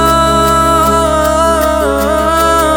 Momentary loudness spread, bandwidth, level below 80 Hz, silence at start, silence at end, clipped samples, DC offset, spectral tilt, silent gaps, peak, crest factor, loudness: 3 LU; over 20 kHz; -24 dBFS; 0 s; 0 s; under 0.1%; under 0.1%; -4.5 dB/octave; none; 0 dBFS; 10 dB; -10 LUFS